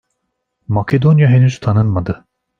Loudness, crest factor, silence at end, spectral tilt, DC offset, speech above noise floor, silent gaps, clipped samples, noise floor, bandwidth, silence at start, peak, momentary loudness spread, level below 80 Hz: -14 LUFS; 12 dB; 0.45 s; -8.5 dB/octave; under 0.1%; 60 dB; none; under 0.1%; -72 dBFS; 7.2 kHz; 0.7 s; -2 dBFS; 12 LU; -44 dBFS